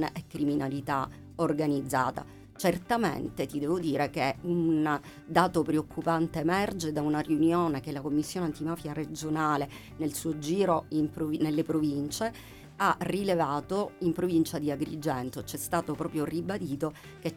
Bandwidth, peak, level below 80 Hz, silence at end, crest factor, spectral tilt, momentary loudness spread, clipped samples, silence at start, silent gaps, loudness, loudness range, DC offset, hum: 17 kHz; -10 dBFS; -58 dBFS; 0 s; 20 dB; -6 dB/octave; 8 LU; under 0.1%; 0 s; none; -30 LUFS; 3 LU; under 0.1%; none